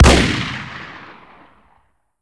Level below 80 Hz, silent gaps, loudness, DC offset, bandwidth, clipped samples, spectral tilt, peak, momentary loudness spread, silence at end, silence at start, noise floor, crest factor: -24 dBFS; none; -17 LUFS; under 0.1%; 11 kHz; under 0.1%; -4.5 dB/octave; 0 dBFS; 25 LU; 1.25 s; 0 s; -60 dBFS; 18 dB